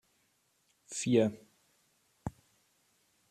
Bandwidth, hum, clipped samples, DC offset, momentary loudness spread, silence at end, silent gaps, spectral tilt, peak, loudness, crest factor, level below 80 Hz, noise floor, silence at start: 13.5 kHz; none; under 0.1%; under 0.1%; 17 LU; 1 s; none; -5.5 dB/octave; -14 dBFS; -31 LUFS; 24 dB; -66 dBFS; -74 dBFS; 0.9 s